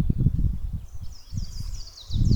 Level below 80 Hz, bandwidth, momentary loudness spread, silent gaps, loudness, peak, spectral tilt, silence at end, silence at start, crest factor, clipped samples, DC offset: -30 dBFS; 19 kHz; 16 LU; none; -30 LUFS; -8 dBFS; -7.5 dB/octave; 0 s; 0 s; 18 dB; under 0.1%; under 0.1%